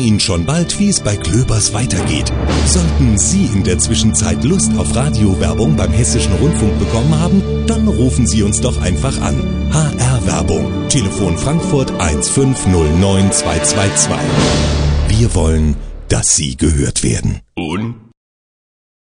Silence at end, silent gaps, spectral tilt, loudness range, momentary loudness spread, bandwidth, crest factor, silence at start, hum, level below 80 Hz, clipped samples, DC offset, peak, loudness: 1.05 s; none; -5 dB/octave; 2 LU; 4 LU; 10.5 kHz; 14 dB; 0 s; none; -22 dBFS; under 0.1%; under 0.1%; 0 dBFS; -13 LUFS